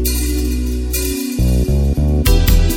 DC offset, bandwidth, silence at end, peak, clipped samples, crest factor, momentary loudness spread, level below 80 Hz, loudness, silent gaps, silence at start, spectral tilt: under 0.1%; 17 kHz; 0 s; 0 dBFS; under 0.1%; 14 dB; 6 LU; -16 dBFS; -17 LUFS; none; 0 s; -5.5 dB/octave